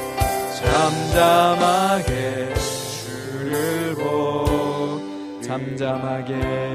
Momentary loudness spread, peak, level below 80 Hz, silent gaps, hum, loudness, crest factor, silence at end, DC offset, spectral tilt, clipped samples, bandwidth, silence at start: 12 LU; -4 dBFS; -36 dBFS; none; none; -21 LUFS; 18 dB; 0 s; under 0.1%; -5 dB/octave; under 0.1%; 15.5 kHz; 0 s